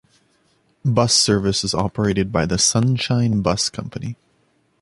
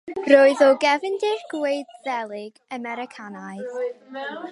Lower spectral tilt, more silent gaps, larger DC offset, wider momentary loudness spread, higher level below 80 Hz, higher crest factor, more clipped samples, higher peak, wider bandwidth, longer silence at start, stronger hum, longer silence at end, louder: about the same, -4 dB/octave vs -4 dB/octave; neither; neither; second, 15 LU vs 20 LU; first, -42 dBFS vs -76 dBFS; about the same, 18 dB vs 20 dB; neither; about the same, -2 dBFS vs -2 dBFS; about the same, 11.5 kHz vs 11.5 kHz; first, 0.85 s vs 0.05 s; neither; first, 0.7 s vs 0 s; first, -18 LUFS vs -21 LUFS